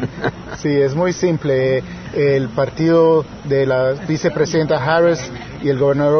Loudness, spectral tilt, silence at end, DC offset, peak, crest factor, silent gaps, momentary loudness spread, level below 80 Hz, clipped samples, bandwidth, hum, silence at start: -17 LUFS; -6.5 dB/octave; 0 s; under 0.1%; -2 dBFS; 14 dB; none; 9 LU; -44 dBFS; under 0.1%; 6.6 kHz; none; 0 s